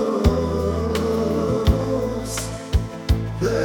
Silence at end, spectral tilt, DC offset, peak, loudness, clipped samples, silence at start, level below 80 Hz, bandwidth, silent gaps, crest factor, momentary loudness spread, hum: 0 s; -6.5 dB/octave; under 0.1%; -4 dBFS; -22 LUFS; under 0.1%; 0 s; -28 dBFS; 19 kHz; none; 18 dB; 5 LU; none